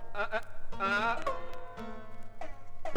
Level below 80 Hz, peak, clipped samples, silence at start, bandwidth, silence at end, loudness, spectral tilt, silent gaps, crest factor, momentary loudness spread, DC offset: -46 dBFS; -12 dBFS; under 0.1%; 0 s; 8.2 kHz; 0 s; -35 LUFS; -4.5 dB/octave; none; 20 dB; 18 LU; under 0.1%